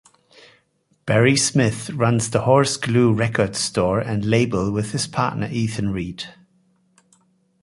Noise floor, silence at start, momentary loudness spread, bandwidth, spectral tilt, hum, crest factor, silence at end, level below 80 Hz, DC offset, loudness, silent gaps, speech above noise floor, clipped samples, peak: -64 dBFS; 1.05 s; 9 LU; 11.5 kHz; -5 dB/octave; none; 18 dB; 1.3 s; -48 dBFS; under 0.1%; -20 LUFS; none; 45 dB; under 0.1%; -2 dBFS